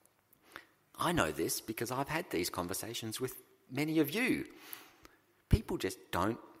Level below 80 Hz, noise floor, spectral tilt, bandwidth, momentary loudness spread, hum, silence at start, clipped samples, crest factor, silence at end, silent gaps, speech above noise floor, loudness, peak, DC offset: -50 dBFS; -68 dBFS; -4.5 dB/octave; 16 kHz; 18 LU; none; 0.5 s; under 0.1%; 24 dB; 0.1 s; none; 33 dB; -35 LUFS; -12 dBFS; under 0.1%